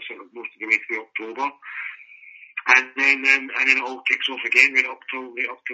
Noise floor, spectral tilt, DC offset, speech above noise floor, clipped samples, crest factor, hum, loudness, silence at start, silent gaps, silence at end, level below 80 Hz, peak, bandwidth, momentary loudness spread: -46 dBFS; 3.5 dB/octave; under 0.1%; 24 dB; under 0.1%; 22 dB; none; -19 LUFS; 0 s; none; 0 s; -86 dBFS; 0 dBFS; 8 kHz; 17 LU